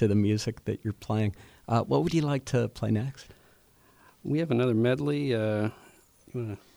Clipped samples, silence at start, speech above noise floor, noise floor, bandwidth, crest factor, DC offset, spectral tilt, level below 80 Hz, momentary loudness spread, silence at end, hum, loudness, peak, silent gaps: under 0.1%; 0 s; 33 dB; -60 dBFS; over 20 kHz; 16 dB; under 0.1%; -7 dB/octave; -58 dBFS; 11 LU; 0.2 s; none; -29 LUFS; -12 dBFS; none